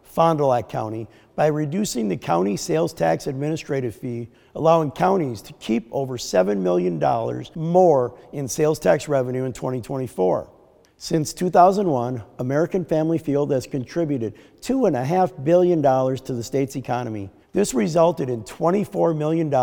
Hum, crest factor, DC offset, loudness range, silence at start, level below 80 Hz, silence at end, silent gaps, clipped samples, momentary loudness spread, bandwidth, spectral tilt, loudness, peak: none; 20 dB; under 0.1%; 2 LU; 0.15 s; -54 dBFS; 0 s; none; under 0.1%; 11 LU; 19 kHz; -6.5 dB/octave; -22 LUFS; -2 dBFS